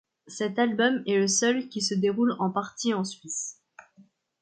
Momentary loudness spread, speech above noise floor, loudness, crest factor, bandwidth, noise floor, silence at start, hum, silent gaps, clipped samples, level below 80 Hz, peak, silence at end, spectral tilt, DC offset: 9 LU; 33 dB; -26 LUFS; 18 dB; 9.6 kHz; -60 dBFS; 0.25 s; none; none; under 0.1%; -74 dBFS; -10 dBFS; 0.4 s; -3.5 dB/octave; under 0.1%